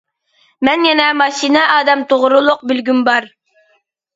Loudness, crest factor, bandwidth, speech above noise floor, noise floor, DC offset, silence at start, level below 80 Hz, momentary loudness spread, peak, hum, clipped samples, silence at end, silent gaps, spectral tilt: -12 LUFS; 14 dB; 7.8 kHz; 47 dB; -60 dBFS; under 0.1%; 0.6 s; -60 dBFS; 5 LU; 0 dBFS; none; under 0.1%; 0.9 s; none; -2.5 dB/octave